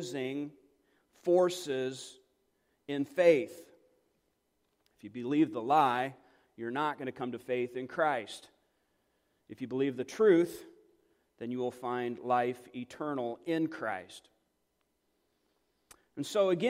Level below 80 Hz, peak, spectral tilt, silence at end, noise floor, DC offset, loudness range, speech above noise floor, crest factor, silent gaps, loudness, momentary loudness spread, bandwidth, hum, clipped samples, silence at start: -80 dBFS; -12 dBFS; -5.5 dB/octave; 0 s; -79 dBFS; under 0.1%; 5 LU; 47 dB; 22 dB; none; -32 LUFS; 18 LU; 16 kHz; none; under 0.1%; 0 s